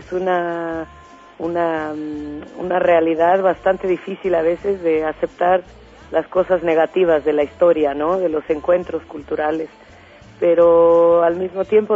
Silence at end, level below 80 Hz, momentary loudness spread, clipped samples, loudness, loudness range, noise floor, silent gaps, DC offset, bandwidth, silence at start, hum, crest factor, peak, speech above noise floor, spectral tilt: 0 s; -50 dBFS; 14 LU; under 0.1%; -18 LUFS; 3 LU; -43 dBFS; none; under 0.1%; 7.4 kHz; 0 s; none; 14 dB; -4 dBFS; 26 dB; -7.5 dB/octave